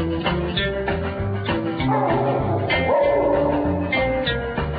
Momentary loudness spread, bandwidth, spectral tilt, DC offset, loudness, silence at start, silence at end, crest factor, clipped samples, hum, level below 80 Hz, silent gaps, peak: 6 LU; 5 kHz; -11.5 dB/octave; under 0.1%; -21 LUFS; 0 s; 0 s; 14 dB; under 0.1%; none; -34 dBFS; none; -8 dBFS